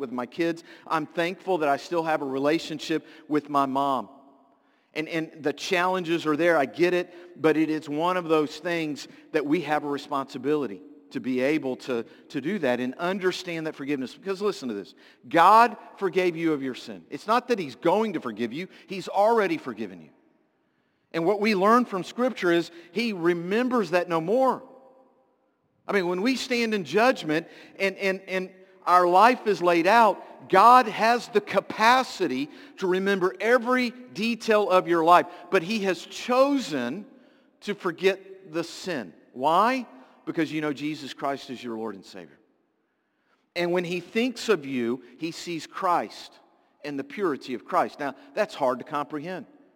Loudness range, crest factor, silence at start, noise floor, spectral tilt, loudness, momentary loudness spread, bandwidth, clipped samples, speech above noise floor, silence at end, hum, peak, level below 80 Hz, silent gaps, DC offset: 8 LU; 22 dB; 0 s; -73 dBFS; -5 dB/octave; -25 LUFS; 15 LU; 17 kHz; under 0.1%; 48 dB; 0.35 s; none; -4 dBFS; -78 dBFS; none; under 0.1%